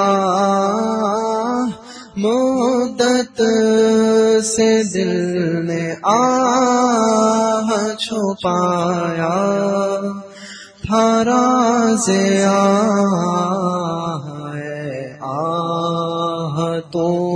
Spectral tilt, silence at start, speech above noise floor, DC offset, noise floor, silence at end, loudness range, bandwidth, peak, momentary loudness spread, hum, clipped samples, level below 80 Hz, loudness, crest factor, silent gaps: -5 dB/octave; 0 s; 21 dB; under 0.1%; -36 dBFS; 0 s; 5 LU; 10.5 kHz; -2 dBFS; 12 LU; none; under 0.1%; -54 dBFS; -17 LUFS; 14 dB; none